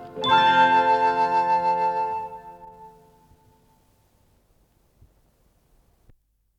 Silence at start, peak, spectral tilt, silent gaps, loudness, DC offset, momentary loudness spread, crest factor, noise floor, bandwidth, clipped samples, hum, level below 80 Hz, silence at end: 0 s; -8 dBFS; -4.5 dB/octave; none; -20 LUFS; under 0.1%; 19 LU; 18 dB; -63 dBFS; 8.4 kHz; under 0.1%; none; -64 dBFS; 3.7 s